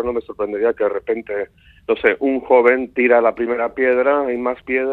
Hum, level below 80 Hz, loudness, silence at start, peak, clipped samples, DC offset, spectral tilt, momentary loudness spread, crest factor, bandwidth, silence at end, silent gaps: none; -52 dBFS; -18 LUFS; 0 s; 0 dBFS; under 0.1%; under 0.1%; -7.5 dB/octave; 10 LU; 18 dB; 4.2 kHz; 0 s; none